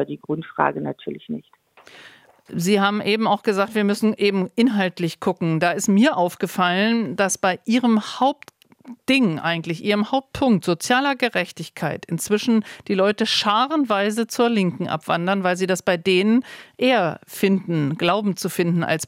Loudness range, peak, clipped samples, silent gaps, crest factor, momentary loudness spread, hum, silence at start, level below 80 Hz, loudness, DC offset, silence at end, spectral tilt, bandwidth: 2 LU; -2 dBFS; under 0.1%; none; 18 dB; 9 LU; none; 0 s; -62 dBFS; -21 LUFS; under 0.1%; 0 s; -5 dB/octave; 16.5 kHz